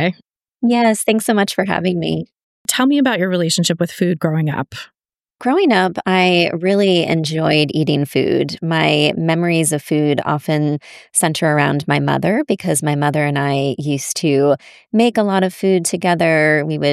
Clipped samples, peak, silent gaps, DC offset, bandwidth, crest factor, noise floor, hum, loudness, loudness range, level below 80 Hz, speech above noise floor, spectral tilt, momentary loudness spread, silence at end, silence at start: under 0.1%; -2 dBFS; 2.43-2.65 s; under 0.1%; 15.5 kHz; 14 dB; -53 dBFS; none; -16 LUFS; 2 LU; -60 dBFS; 37 dB; -5 dB/octave; 6 LU; 0 s; 0 s